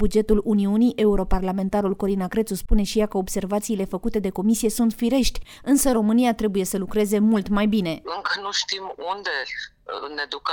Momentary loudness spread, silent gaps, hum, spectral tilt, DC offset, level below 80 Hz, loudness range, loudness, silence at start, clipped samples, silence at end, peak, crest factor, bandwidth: 9 LU; none; none; -5 dB/octave; under 0.1%; -32 dBFS; 3 LU; -23 LUFS; 0 s; under 0.1%; 0 s; -4 dBFS; 18 dB; 19.5 kHz